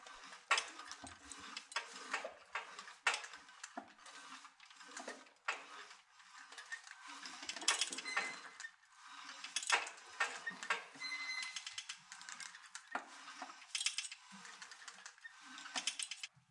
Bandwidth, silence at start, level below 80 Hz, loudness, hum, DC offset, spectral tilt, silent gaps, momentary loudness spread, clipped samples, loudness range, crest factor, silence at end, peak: 11.5 kHz; 0 s; -88 dBFS; -43 LUFS; none; under 0.1%; 1.5 dB/octave; none; 18 LU; under 0.1%; 9 LU; 28 dB; 0.1 s; -18 dBFS